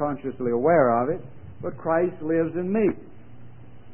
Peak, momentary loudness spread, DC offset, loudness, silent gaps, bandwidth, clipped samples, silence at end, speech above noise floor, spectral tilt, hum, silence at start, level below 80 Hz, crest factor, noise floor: -6 dBFS; 16 LU; 0.9%; -24 LUFS; none; 3.2 kHz; under 0.1%; 0.3 s; 23 dB; -12.5 dB/octave; none; 0 s; -56 dBFS; 18 dB; -46 dBFS